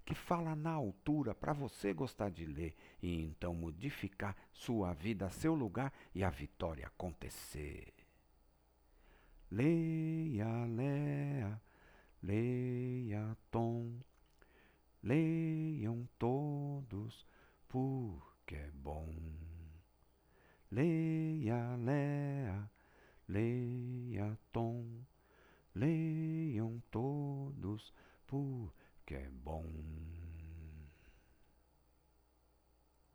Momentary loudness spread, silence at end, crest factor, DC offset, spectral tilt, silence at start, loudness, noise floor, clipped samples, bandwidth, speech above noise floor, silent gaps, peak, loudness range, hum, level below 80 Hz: 14 LU; 2.05 s; 20 dB; under 0.1%; -8 dB/octave; 0 s; -41 LUFS; -73 dBFS; under 0.1%; over 20 kHz; 33 dB; none; -22 dBFS; 8 LU; none; -58 dBFS